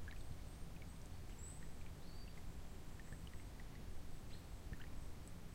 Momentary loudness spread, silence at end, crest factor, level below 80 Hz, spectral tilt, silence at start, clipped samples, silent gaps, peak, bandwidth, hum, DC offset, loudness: 2 LU; 0 s; 12 dB; -54 dBFS; -5 dB/octave; 0 s; under 0.1%; none; -36 dBFS; 16 kHz; none; under 0.1%; -55 LUFS